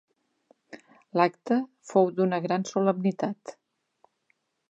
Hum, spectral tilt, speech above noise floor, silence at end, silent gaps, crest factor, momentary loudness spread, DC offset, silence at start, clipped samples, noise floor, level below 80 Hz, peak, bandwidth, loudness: none; -6.5 dB/octave; 48 dB; 1.15 s; none; 22 dB; 8 LU; under 0.1%; 0.75 s; under 0.1%; -73 dBFS; -82 dBFS; -6 dBFS; 8.2 kHz; -27 LUFS